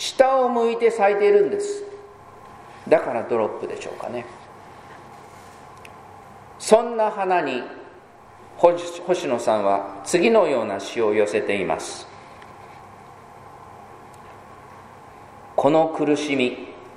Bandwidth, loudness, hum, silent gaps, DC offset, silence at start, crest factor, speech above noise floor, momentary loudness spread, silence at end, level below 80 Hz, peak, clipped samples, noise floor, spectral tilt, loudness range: 13 kHz; -21 LUFS; none; none; under 0.1%; 0 s; 22 dB; 26 dB; 26 LU; 0 s; -62 dBFS; 0 dBFS; under 0.1%; -46 dBFS; -4.5 dB/octave; 12 LU